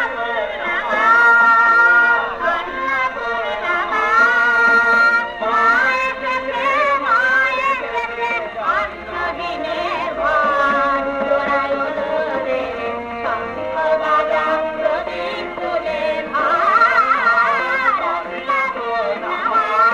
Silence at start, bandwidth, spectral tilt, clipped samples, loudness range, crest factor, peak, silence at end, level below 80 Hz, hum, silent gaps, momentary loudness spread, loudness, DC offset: 0 s; 10.5 kHz; -3.5 dB/octave; under 0.1%; 6 LU; 14 dB; -2 dBFS; 0 s; -48 dBFS; none; none; 11 LU; -16 LUFS; under 0.1%